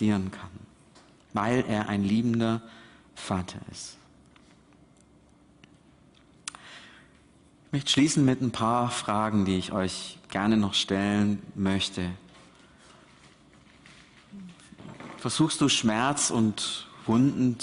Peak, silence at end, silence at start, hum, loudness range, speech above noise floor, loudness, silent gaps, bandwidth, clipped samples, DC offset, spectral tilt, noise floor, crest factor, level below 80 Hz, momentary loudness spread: -12 dBFS; 0 s; 0 s; none; 20 LU; 32 dB; -26 LUFS; none; 11 kHz; under 0.1%; under 0.1%; -4.5 dB/octave; -58 dBFS; 18 dB; -60 dBFS; 22 LU